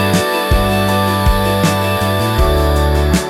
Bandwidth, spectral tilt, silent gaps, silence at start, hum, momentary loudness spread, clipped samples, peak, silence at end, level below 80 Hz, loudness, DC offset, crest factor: 17 kHz; -5.5 dB/octave; none; 0 s; none; 1 LU; under 0.1%; -2 dBFS; 0 s; -20 dBFS; -14 LUFS; under 0.1%; 12 dB